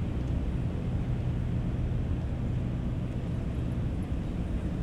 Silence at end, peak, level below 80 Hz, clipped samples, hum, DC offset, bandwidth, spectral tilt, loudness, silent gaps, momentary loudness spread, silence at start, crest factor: 0 s; -18 dBFS; -36 dBFS; under 0.1%; none; under 0.1%; 9.4 kHz; -9 dB/octave; -32 LUFS; none; 2 LU; 0 s; 12 dB